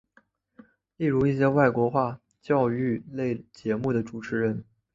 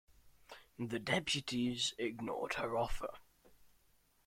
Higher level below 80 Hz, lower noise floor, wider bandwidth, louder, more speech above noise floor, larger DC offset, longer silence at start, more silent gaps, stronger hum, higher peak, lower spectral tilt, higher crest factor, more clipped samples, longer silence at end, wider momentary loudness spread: about the same, -58 dBFS vs -56 dBFS; second, -64 dBFS vs -72 dBFS; second, 7.6 kHz vs 16.5 kHz; first, -26 LUFS vs -38 LUFS; first, 39 dB vs 34 dB; neither; first, 1 s vs 0.1 s; neither; neither; first, -6 dBFS vs -18 dBFS; first, -9 dB/octave vs -3.5 dB/octave; about the same, 20 dB vs 22 dB; neither; second, 0.3 s vs 0.6 s; second, 10 LU vs 14 LU